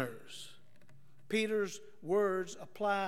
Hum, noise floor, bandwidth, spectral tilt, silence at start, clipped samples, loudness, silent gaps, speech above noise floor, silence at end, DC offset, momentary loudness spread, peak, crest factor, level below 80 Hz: none; -64 dBFS; 16 kHz; -4.5 dB/octave; 0 s; under 0.1%; -35 LUFS; none; 30 dB; 0 s; 0.3%; 17 LU; -20 dBFS; 16 dB; -86 dBFS